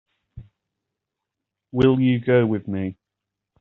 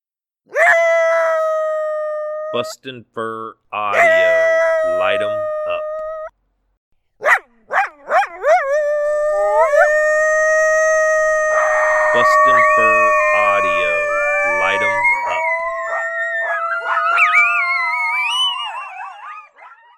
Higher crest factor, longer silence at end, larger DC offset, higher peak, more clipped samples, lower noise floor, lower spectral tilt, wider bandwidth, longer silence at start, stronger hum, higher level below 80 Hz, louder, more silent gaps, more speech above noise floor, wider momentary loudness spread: about the same, 18 dB vs 16 dB; first, 0.7 s vs 0.3 s; neither; second, -4 dBFS vs 0 dBFS; neither; first, -84 dBFS vs -62 dBFS; first, -7 dB/octave vs -1.5 dB/octave; second, 5.8 kHz vs 13.5 kHz; second, 0.35 s vs 0.5 s; neither; about the same, -52 dBFS vs -52 dBFS; second, -21 LUFS vs -15 LUFS; second, none vs 6.77-6.91 s; first, 65 dB vs 47 dB; about the same, 12 LU vs 14 LU